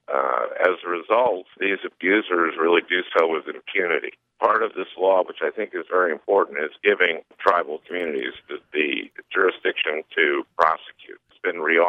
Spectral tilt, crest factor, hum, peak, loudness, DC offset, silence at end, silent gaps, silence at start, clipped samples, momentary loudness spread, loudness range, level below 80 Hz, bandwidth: -5 dB/octave; 18 dB; none; -4 dBFS; -22 LUFS; under 0.1%; 0 s; none; 0.1 s; under 0.1%; 9 LU; 2 LU; -74 dBFS; 6.4 kHz